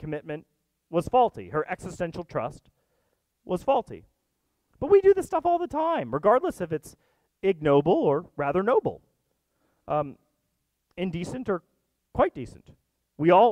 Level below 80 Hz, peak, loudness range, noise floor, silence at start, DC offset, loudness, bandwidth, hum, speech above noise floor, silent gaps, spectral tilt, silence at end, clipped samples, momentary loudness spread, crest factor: -56 dBFS; -6 dBFS; 8 LU; -77 dBFS; 0 s; under 0.1%; -26 LUFS; 12.5 kHz; none; 53 dB; none; -7 dB/octave; 0 s; under 0.1%; 15 LU; 20 dB